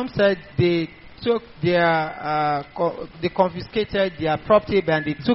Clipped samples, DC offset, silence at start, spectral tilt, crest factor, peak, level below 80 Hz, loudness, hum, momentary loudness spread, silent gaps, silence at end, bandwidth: under 0.1%; under 0.1%; 0 s; -4.5 dB/octave; 16 dB; -4 dBFS; -48 dBFS; -22 LUFS; none; 7 LU; none; 0 s; 5.8 kHz